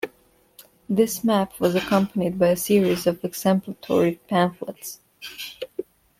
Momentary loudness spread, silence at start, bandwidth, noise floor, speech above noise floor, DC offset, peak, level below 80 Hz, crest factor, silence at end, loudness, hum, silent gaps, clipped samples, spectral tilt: 16 LU; 0.05 s; 16.5 kHz; -59 dBFS; 37 dB; under 0.1%; -6 dBFS; -58 dBFS; 16 dB; 0.35 s; -22 LUFS; none; none; under 0.1%; -5.5 dB/octave